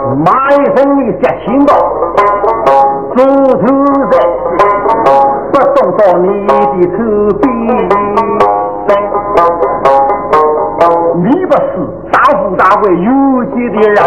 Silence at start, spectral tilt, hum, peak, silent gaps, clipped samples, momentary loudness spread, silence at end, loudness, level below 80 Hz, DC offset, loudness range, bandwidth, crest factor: 0 s; -8 dB/octave; none; 0 dBFS; none; 2%; 4 LU; 0 s; -9 LUFS; -38 dBFS; 1%; 1 LU; 9 kHz; 8 dB